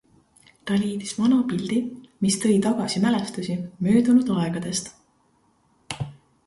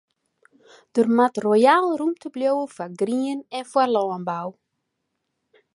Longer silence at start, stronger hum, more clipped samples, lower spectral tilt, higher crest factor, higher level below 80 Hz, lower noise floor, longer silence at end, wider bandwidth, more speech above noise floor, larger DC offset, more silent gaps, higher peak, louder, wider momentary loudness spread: second, 0.65 s vs 0.95 s; neither; neither; about the same, -5.5 dB/octave vs -5.5 dB/octave; about the same, 16 dB vs 20 dB; first, -58 dBFS vs -76 dBFS; second, -64 dBFS vs -77 dBFS; second, 0.35 s vs 1.25 s; about the same, 11.5 kHz vs 11.5 kHz; second, 42 dB vs 56 dB; neither; neither; second, -8 dBFS vs -4 dBFS; about the same, -23 LUFS vs -22 LUFS; about the same, 14 LU vs 13 LU